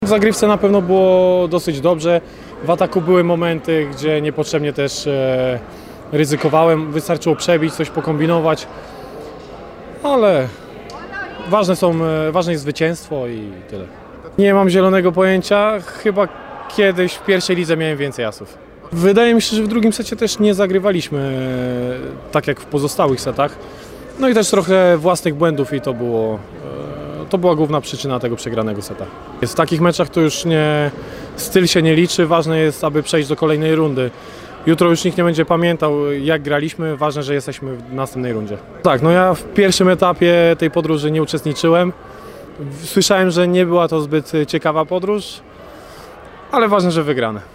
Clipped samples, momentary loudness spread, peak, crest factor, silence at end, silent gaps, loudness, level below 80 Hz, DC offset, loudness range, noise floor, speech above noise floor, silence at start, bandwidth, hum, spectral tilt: under 0.1%; 18 LU; 0 dBFS; 16 dB; 0.05 s; none; -16 LUFS; -46 dBFS; under 0.1%; 4 LU; -37 dBFS; 21 dB; 0 s; 16 kHz; none; -5.5 dB/octave